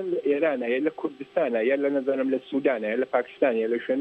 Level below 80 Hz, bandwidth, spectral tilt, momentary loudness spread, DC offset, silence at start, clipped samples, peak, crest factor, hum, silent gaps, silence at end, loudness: -76 dBFS; 7.4 kHz; -7.5 dB/octave; 4 LU; under 0.1%; 0 s; under 0.1%; -8 dBFS; 16 dB; none; none; 0 s; -26 LUFS